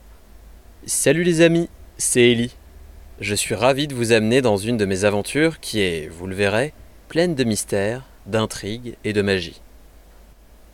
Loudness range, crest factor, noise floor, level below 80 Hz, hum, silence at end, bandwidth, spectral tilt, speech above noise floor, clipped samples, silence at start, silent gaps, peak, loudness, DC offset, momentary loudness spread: 4 LU; 18 dB; -47 dBFS; -46 dBFS; none; 1.15 s; 17 kHz; -4.5 dB/octave; 27 dB; under 0.1%; 0.05 s; none; -4 dBFS; -20 LUFS; under 0.1%; 13 LU